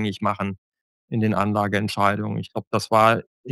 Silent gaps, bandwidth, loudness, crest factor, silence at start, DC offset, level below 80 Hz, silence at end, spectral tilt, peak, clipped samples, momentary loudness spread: 0.58-0.72 s, 0.81-1.08 s, 2.67-2.71 s, 3.27-3.44 s; 12.5 kHz; -22 LUFS; 22 dB; 0 s; under 0.1%; -62 dBFS; 0 s; -6 dB/octave; -2 dBFS; under 0.1%; 12 LU